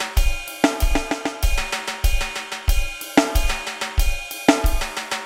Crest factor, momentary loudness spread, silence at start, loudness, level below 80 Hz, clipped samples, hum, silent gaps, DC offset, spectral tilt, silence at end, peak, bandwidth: 20 dB; 7 LU; 0 s; -23 LUFS; -22 dBFS; under 0.1%; none; none; under 0.1%; -4 dB/octave; 0 s; 0 dBFS; 17 kHz